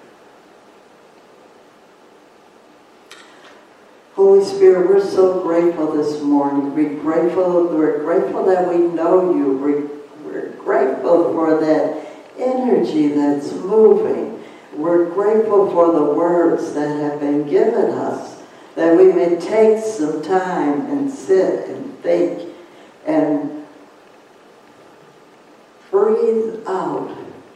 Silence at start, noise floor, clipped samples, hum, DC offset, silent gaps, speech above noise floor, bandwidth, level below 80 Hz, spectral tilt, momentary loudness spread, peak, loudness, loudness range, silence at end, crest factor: 3.1 s; -47 dBFS; under 0.1%; none; under 0.1%; none; 32 dB; 9.8 kHz; -70 dBFS; -7 dB/octave; 16 LU; -2 dBFS; -16 LUFS; 7 LU; 0.15 s; 16 dB